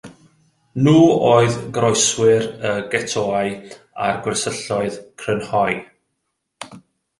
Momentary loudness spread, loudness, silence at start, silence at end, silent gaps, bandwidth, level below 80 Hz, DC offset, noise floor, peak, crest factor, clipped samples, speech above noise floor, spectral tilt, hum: 20 LU; -18 LUFS; 0.05 s; 0.4 s; none; 11.5 kHz; -54 dBFS; under 0.1%; -74 dBFS; -2 dBFS; 18 dB; under 0.1%; 57 dB; -4.5 dB/octave; none